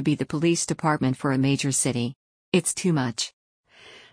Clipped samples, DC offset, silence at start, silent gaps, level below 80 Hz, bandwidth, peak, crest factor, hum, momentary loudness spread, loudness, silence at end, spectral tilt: under 0.1%; under 0.1%; 0 s; 2.15-2.52 s, 3.33-3.64 s; -60 dBFS; 10.5 kHz; -8 dBFS; 18 dB; none; 7 LU; -24 LUFS; 0.15 s; -4.5 dB/octave